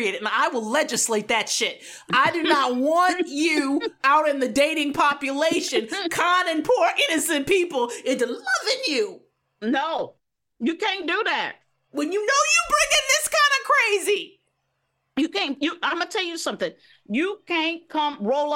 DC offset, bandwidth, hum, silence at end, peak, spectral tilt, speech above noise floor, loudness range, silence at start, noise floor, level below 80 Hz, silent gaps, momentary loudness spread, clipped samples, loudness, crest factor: under 0.1%; 16.5 kHz; none; 0 s; -6 dBFS; -1.5 dB/octave; 51 dB; 6 LU; 0 s; -74 dBFS; -60 dBFS; none; 9 LU; under 0.1%; -22 LUFS; 18 dB